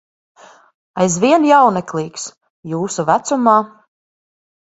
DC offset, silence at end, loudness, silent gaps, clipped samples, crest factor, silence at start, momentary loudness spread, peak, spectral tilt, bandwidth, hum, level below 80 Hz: under 0.1%; 1 s; -15 LUFS; 2.37-2.41 s, 2.50-2.63 s; under 0.1%; 16 dB; 0.95 s; 19 LU; 0 dBFS; -5 dB/octave; 8.2 kHz; none; -60 dBFS